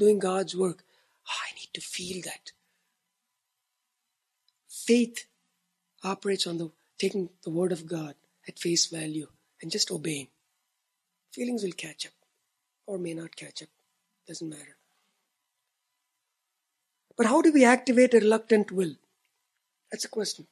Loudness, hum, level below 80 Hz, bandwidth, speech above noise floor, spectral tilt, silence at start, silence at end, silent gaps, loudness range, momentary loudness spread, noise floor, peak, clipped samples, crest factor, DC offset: -27 LUFS; none; -80 dBFS; 14 kHz; 55 dB; -4 dB/octave; 0 s; 0.1 s; none; 18 LU; 23 LU; -82 dBFS; -6 dBFS; under 0.1%; 24 dB; under 0.1%